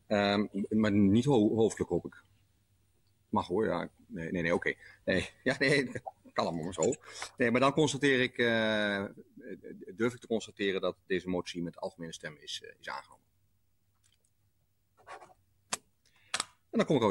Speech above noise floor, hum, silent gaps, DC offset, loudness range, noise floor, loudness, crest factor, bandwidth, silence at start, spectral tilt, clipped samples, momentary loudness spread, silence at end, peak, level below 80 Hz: 45 dB; none; none; under 0.1%; 16 LU; -76 dBFS; -31 LUFS; 18 dB; 12 kHz; 0.1 s; -5 dB/octave; under 0.1%; 17 LU; 0 s; -14 dBFS; -64 dBFS